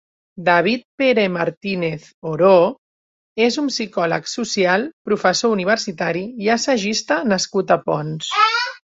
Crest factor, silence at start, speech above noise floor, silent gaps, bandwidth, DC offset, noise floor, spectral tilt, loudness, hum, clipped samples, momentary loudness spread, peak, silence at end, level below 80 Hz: 16 dB; 0.35 s; over 72 dB; 0.85-0.98 s, 1.57-1.61 s, 2.14-2.22 s, 2.78-3.36 s, 4.93-5.05 s; 8 kHz; under 0.1%; under -90 dBFS; -4 dB/octave; -18 LUFS; none; under 0.1%; 7 LU; -2 dBFS; 0.25 s; -62 dBFS